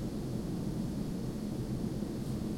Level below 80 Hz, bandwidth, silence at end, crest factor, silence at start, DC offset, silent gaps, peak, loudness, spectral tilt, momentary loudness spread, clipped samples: -48 dBFS; 16.5 kHz; 0 s; 12 dB; 0 s; under 0.1%; none; -24 dBFS; -37 LUFS; -7.5 dB/octave; 1 LU; under 0.1%